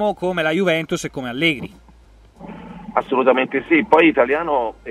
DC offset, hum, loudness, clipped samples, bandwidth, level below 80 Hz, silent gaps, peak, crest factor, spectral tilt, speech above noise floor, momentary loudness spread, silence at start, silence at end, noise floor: under 0.1%; none; -18 LUFS; under 0.1%; 13.5 kHz; -50 dBFS; none; 0 dBFS; 18 dB; -5 dB/octave; 30 dB; 22 LU; 0 s; 0 s; -48 dBFS